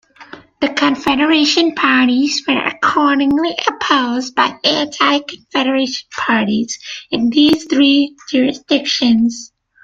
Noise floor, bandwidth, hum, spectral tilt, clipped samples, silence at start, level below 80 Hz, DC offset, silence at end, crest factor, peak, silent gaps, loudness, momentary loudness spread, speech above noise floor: -38 dBFS; 7.6 kHz; none; -3 dB/octave; under 0.1%; 0.2 s; -54 dBFS; under 0.1%; 0.4 s; 14 dB; 0 dBFS; none; -14 LUFS; 7 LU; 24 dB